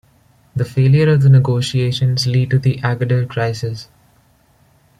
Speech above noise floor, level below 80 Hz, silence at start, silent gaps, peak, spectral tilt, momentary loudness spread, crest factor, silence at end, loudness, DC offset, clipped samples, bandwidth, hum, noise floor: 40 dB; -48 dBFS; 0.55 s; none; -2 dBFS; -7 dB/octave; 13 LU; 14 dB; 1.15 s; -15 LUFS; under 0.1%; under 0.1%; 10.5 kHz; none; -54 dBFS